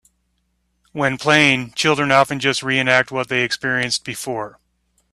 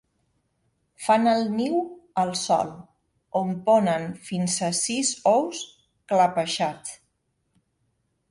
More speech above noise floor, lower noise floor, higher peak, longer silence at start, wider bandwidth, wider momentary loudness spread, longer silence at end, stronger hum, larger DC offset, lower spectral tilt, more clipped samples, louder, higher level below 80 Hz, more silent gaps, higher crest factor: about the same, 50 dB vs 50 dB; second, -68 dBFS vs -74 dBFS; first, 0 dBFS vs -8 dBFS; about the same, 0.95 s vs 1 s; first, 15 kHz vs 11.5 kHz; about the same, 12 LU vs 11 LU; second, 0.65 s vs 1.35 s; first, 60 Hz at -55 dBFS vs none; neither; about the same, -3.5 dB/octave vs -4 dB/octave; neither; first, -17 LUFS vs -24 LUFS; first, -58 dBFS vs -68 dBFS; neither; about the same, 20 dB vs 18 dB